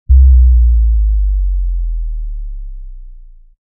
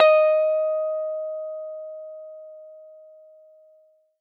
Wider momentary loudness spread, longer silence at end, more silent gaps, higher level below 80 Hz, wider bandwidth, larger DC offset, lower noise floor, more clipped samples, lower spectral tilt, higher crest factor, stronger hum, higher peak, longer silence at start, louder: second, 22 LU vs 25 LU; second, 0.45 s vs 1.25 s; neither; first, -12 dBFS vs under -90 dBFS; second, 0.2 kHz vs 4.7 kHz; neither; second, -35 dBFS vs -59 dBFS; neither; first, -27 dB/octave vs 0 dB/octave; second, 10 dB vs 22 dB; neither; first, 0 dBFS vs -4 dBFS; about the same, 0.1 s vs 0 s; first, -13 LUFS vs -23 LUFS